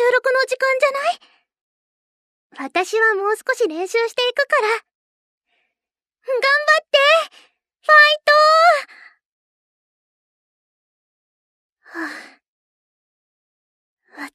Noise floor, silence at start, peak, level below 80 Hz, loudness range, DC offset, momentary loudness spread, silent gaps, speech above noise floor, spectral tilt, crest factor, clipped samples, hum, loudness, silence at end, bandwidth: -88 dBFS; 0 s; -2 dBFS; -86 dBFS; 24 LU; under 0.1%; 20 LU; 1.61-2.50 s, 4.95-5.41 s, 9.25-11.77 s, 12.47-13.97 s; 72 dB; 0.5 dB/octave; 18 dB; under 0.1%; none; -16 LUFS; 0.05 s; 14 kHz